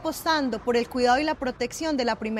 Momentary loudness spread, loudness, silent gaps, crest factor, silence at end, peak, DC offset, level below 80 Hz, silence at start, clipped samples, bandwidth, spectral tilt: 7 LU; -25 LUFS; none; 16 dB; 0 s; -10 dBFS; under 0.1%; -50 dBFS; 0 s; under 0.1%; 16 kHz; -3.5 dB/octave